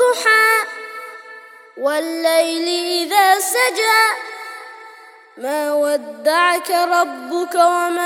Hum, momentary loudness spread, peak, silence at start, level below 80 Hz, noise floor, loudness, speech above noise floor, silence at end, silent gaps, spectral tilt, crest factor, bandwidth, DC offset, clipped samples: none; 18 LU; 0 dBFS; 0 s; -80 dBFS; -42 dBFS; -16 LUFS; 26 dB; 0 s; none; 0.5 dB/octave; 18 dB; 18.5 kHz; under 0.1%; under 0.1%